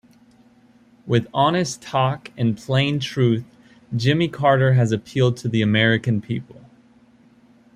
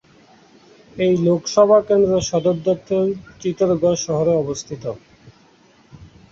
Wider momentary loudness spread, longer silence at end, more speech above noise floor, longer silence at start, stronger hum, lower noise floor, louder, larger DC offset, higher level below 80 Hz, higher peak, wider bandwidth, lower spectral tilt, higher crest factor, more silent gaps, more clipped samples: second, 7 LU vs 13 LU; first, 1.35 s vs 0.25 s; about the same, 34 dB vs 35 dB; about the same, 1.05 s vs 0.95 s; neither; about the same, -53 dBFS vs -53 dBFS; about the same, -20 LUFS vs -18 LUFS; neither; about the same, -56 dBFS vs -52 dBFS; about the same, -2 dBFS vs -2 dBFS; first, 10.5 kHz vs 7.8 kHz; about the same, -6 dB/octave vs -6 dB/octave; about the same, 18 dB vs 18 dB; neither; neither